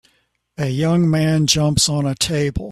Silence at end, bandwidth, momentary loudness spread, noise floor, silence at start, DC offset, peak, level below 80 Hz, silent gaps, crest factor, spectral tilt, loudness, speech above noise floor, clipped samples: 0 s; 14 kHz; 6 LU; -64 dBFS; 0.6 s; under 0.1%; -2 dBFS; -40 dBFS; none; 18 dB; -4.5 dB/octave; -17 LUFS; 47 dB; under 0.1%